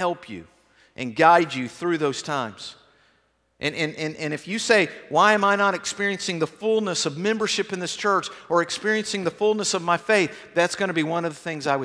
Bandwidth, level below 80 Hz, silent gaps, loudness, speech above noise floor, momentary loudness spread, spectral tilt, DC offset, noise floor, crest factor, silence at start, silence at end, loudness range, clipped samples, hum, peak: 11 kHz; -68 dBFS; none; -23 LUFS; 43 dB; 11 LU; -3.5 dB/octave; under 0.1%; -66 dBFS; 22 dB; 0 s; 0 s; 4 LU; under 0.1%; none; -2 dBFS